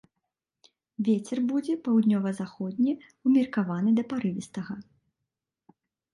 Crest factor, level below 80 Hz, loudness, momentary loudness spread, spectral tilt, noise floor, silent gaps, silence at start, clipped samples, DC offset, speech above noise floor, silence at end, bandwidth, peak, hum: 16 dB; -74 dBFS; -27 LUFS; 13 LU; -7.5 dB/octave; -86 dBFS; none; 1 s; under 0.1%; under 0.1%; 59 dB; 1.3 s; 11 kHz; -14 dBFS; none